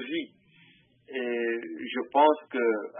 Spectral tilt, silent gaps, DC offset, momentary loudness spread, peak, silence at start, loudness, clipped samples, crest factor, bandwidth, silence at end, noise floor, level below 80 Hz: -8 dB/octave; none; under 0.1%; 12 LU; -8 dBFS; 0 s; -28 LUFS; under 0.1%; 20 dB; 3.7 kHz; 0 s; -60 dBFS; -84 dBFS